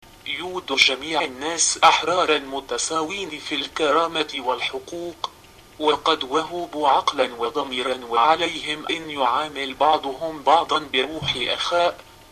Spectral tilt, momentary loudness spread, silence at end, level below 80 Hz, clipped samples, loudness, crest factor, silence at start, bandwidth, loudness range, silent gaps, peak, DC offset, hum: -1.5 dB/octave; 11 LU; 0.3 s; -54 dBFS; under 0.1%; -21 LUFS; 20 dB; 0.25 s; 14 kHz; 4 LU; none; -2 dBFS; under 0.1%; none